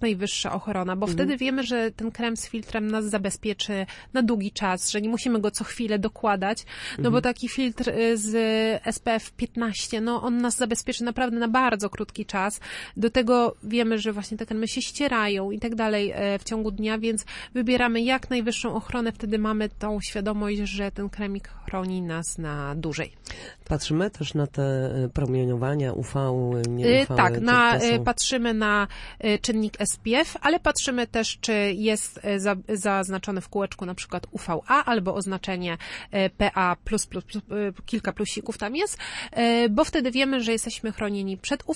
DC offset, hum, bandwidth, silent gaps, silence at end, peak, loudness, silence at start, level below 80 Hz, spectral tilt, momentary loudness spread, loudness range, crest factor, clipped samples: under 0.1%; none; 11.5 kHz; none; 0 s; -6 dBFS; -25 LUFS; 0 s; -46 dBFS; -4.5 dB/octave; 9 LU; 6 LU; 20 dB; under 0.1%